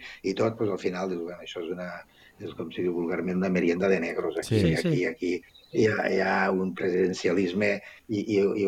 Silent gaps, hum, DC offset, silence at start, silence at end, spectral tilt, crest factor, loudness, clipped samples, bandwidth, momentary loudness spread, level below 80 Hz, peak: none; none; under 0.1%; 0 s; 0 s; -6.5 dB/octave; 16 dB; -27 LUFS; under 0.1%; 15 kHz; 12 LU; -60 dBFS; -10 dBFS